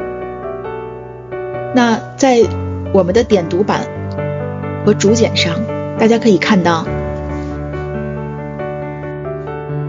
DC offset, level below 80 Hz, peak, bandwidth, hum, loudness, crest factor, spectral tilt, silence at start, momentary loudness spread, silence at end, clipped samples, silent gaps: under 0.1%; -36 dBFS; 0 dBFS; 7.6 kHz; none; -16 LUFS; 16 dB; -5.5 dB/octave; 0 s; 13 LU; 0 s; under 0.1%; none